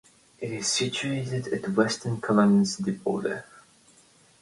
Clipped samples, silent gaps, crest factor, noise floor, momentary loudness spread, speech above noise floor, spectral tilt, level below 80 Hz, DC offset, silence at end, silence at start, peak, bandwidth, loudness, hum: under 0.1%; none; 20 dB; -58 dBFS; 11 LU; 33 dB; -4.5 dB/octave; -64 dBFS; under 0.1%; 0.8 s; 0.4 s; -6 dBFS; 11.5 kHz; -26 LUFS; none